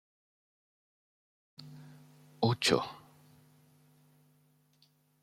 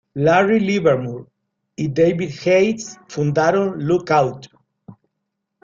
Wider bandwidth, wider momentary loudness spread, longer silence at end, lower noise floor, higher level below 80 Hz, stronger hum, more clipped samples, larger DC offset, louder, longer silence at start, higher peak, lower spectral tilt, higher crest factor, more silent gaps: first, 15 kHz vs 7.6 kHz; first, 27 LU vs 14 LU; first, 2.25 s vs 0.7 s; second, -70 dBFS vs -77 dBFS; second, -74 dBFS vs -58 dBFS; first, 50 Hz at -60 dBFS vs none; neither; neither; second, -31 LUFS vs -18 LUFS; first, 1.6 s vs 0.15 s; second, -12 dBFS vs -2 dBFS; second, -4.5 dB/octave vs -6.5 dB/octave; first, 28 dB vs 16 dB; neither